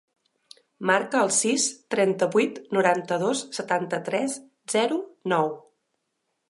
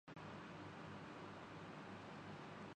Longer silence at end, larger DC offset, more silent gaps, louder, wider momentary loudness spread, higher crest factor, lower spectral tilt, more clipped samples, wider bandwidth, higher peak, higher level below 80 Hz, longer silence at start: first, 0.9 s vs 0 s; neither; neither; first, -24 LUFS vs -54 LUFS; first, 8 LU vs 1 LU; first, 20 dB vs 12 dB; second, -3 dB/octave vs -6 dB/octave; neither; first, 11.5 kHz vs 10 kHz; first, -6 dBFS vs -42 dBFS; about the same, -80 dBFS vs -78 dBFS; first, 0.8 s vs 0.05 s